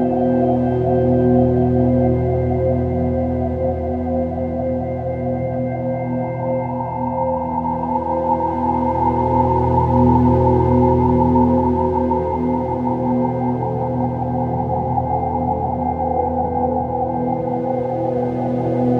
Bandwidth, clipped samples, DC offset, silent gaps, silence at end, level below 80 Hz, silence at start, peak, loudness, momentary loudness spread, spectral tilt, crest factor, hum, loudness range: 4.2 kHz; under 0.1%; under 0.1%; none; 0 s; -34 dBFS; 0 s; -2 dBFS; -18 LUFS; 7 LU; -11.5 dB/octave; 16 dB; none; 6 LU